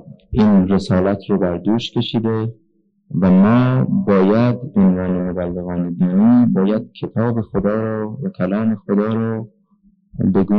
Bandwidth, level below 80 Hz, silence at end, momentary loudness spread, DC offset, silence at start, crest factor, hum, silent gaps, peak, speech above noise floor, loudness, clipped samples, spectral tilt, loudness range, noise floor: 6.4 kHz; -44 dBFS; 0 s; 11 LU; under 0.1%; 0.1 s; 10 dB; none; none; -6 dBFS; 40 dB; -17 LUFS; under 0.1%; -9 dB/octave; 5 LU; -56 dBFS